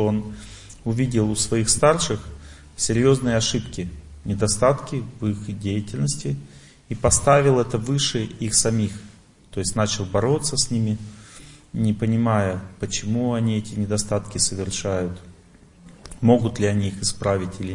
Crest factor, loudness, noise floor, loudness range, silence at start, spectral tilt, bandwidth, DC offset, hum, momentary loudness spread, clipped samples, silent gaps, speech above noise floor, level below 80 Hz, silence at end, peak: 20 dB; -22 LUFS; -50 dBFS; 4 LU; 0 s; -4.5 dB/octave; 11 kHz; under 0.1%; none; 14 LU; under 0.1%; none; 28 dB; -42 dBFS; 0 s; -2 dBFS